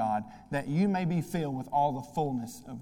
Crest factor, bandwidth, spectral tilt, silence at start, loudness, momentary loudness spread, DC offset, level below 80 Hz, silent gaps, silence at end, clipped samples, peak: 14 dB; 17 kHz; -7 dB/octave; 0 s; -31 LUFS; 8 LU; under 0.1%; -60 dBFS; none; 0 s; under 0.1%; -16 dBFS